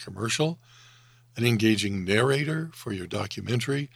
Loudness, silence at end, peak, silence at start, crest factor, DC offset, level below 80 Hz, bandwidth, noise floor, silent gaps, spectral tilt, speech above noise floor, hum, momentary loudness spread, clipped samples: -26 LUFS; 0.1 s; -6 dBFS; 0 s; 20 dB; under 0.1%; -64 dBFS; 15.5 kHz; -56 dBFS; none; -5 dB/octave; 29 dB; none; 11 LU; under 0.1%